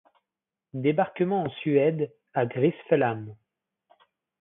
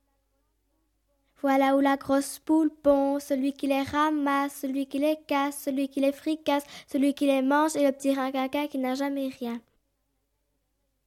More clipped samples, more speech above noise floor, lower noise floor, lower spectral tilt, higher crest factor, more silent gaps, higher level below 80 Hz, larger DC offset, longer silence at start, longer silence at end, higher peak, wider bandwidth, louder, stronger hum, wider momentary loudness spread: neither; first, 64 dB vs 50 dB; first, -89 dBFS vs -76 dBFS; first, -11.5 dB/octave vs -4 dB/octave; about the same, 20 dB vs 16 dB; neither; second, -72 dBFS vs -64 dBFS; neither; second, 0.75 s vs 1.45 s; second, 1.05 s vs 1.45 s; about the same, -8 dBFS vs -10 dBFS; second, 3.9 kHz vs 15.5 kHz; about the same, -26 LUFS vs -26 LUFS; neither; first, 10 LU vs 7 LU